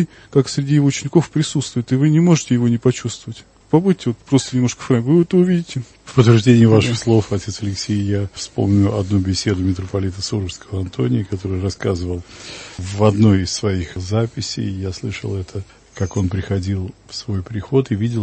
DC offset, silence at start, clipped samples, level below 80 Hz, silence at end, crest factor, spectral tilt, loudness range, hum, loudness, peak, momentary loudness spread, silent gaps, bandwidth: under 0.1%; 0 s; under 0.1%; -44 dBFS; 0 s; 18 dB; -6.5 dB/octave; 8 LU; none; -18 LUFS; 0 dBFS; 13 LU; none; 8.8 kHz